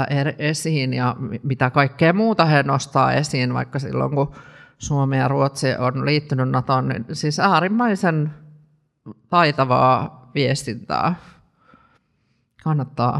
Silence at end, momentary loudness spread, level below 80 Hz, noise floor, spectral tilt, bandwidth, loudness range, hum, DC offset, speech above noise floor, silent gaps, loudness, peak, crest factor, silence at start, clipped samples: 0 s; 9 LU; -54 dBFS; -66 dBFS; -6 dB/octave; 12.5 kHz; 3 LU; none; under 0.1%; 47 dB; none; -20 LUFS; 0 dBFS; 20 dB; 0 s; under 0.1%